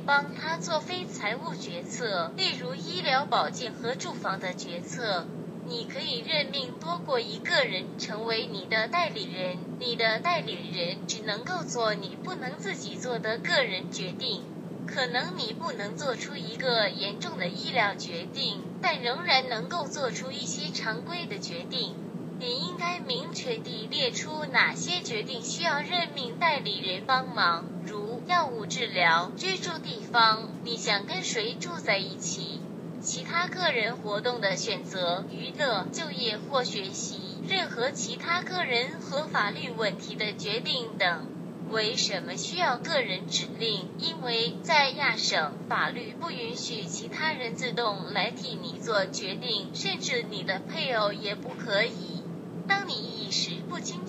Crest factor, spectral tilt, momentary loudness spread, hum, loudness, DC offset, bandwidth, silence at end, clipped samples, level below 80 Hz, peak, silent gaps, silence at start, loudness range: 22 dB; -3 dB/octave; 9 LU; none; -29 LUFS; under 0.1%; 15.5 kHz; 0 s; under 0.1%; -76 dBFS; -8 dBFS; none; 0 s; 4 LU